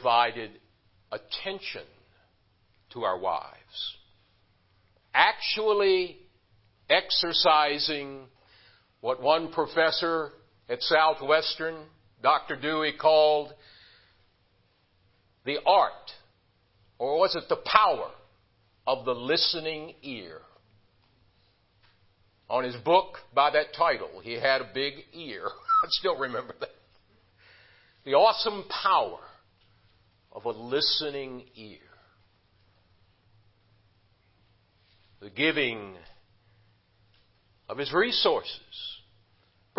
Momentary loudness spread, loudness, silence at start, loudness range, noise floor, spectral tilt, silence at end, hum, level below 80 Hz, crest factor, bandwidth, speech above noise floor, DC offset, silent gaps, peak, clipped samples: 19 LU; -26 LUFS; 0 s; 8 LU; -67 dBFS; -6.5 dB/octave; 0.8 s; none; -68 dBFS; 26 dB; 5.8 kHz; 41 dB; under 0.1%; none; -2 dBFS; under 0.1%